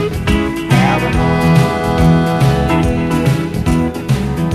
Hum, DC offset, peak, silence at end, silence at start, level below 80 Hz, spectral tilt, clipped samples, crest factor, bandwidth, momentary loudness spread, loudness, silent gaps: none; under 0.1%; 0 dBFS; 0 s; 0 s; -24 dBFS; -7 dB/octave; under 0.1%; 12 dB; 14 kHz; 5 LU; -14 LUFS; none